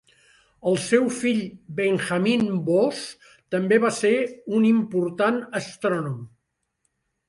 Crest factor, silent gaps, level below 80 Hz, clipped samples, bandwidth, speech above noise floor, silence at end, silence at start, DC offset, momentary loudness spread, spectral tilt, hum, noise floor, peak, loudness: 18 dB; none; -66 dBFS; under 0.1%; 11.5 kHz; 54 dB; 1 s; 0.65 s; under 0.1%; 10 LU; -5.5 dB/octave; none; -76 dBFS; -6 dBFS; -23 LUFS